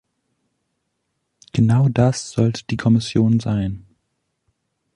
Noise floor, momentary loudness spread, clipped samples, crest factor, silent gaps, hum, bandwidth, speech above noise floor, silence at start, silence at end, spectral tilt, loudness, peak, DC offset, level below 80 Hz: -74 dBFS; 9 LU; under 0.1%; 18 dB; none; none; 10.5 kHz; 57 dB; 1.55 s; 1.2 s; -7 dB/octave; -19 LUFS; -2 dBFS; under 0.1%; -46 dBFS